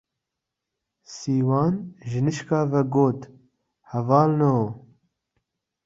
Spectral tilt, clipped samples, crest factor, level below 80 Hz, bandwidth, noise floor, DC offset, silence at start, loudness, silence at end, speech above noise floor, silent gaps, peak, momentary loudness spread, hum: -8 dB/octave; under 0.1%; 20 dB; -62 dBFS; 7.8 kHz; -84 dBFS; under 0.1%; 1.1 s; -23 LUFS; 1.1 s; 62 dB; none; -4 dBFS; 14 LU; none